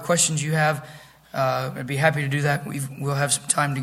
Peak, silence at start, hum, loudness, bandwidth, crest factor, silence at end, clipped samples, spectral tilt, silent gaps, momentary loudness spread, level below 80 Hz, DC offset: -2 dBFS; 0 s; none; -23 LUFS; 16 kHz; 20 dB; 0 s; under 0.1%; -4 dB/octave; none; 10 LU; -60 dBFS; under 0.1%